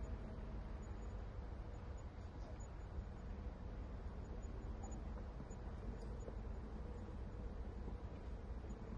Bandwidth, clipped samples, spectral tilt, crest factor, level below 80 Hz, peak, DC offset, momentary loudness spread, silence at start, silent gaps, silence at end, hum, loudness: 7.4 kHz; under 0.1%; -7.5 dB/octave; 14 dB; -50 dBFS; -36 dBFS; under 0.1%; 2 LU; 0 s; none; 0 s; none; -52 LUFS